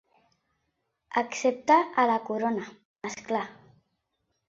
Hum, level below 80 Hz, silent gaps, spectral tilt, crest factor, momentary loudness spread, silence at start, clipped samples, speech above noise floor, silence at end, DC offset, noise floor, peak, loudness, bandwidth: none; -74 dBFS; 2.85-2.96 s; -4 dB/octave; 20 dB; 17 LU; 1.1 s; under 0.1%; 52 dB; 0.95 s; under 0.1%; -79 dBFS; -8 dBFS; -27 LUFS; 7.8 kHz